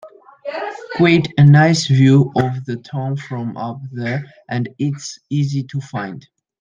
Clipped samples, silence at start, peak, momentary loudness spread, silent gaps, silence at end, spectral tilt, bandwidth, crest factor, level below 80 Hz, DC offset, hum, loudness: under 0.1%; 0.05 s; -2 dBFS; 15 LU; none; 0.4 s; -6.5 dB/octave; 7.6 kHz; 16 dB; -56 dBFS; under 0.1%; none; -17 LUFS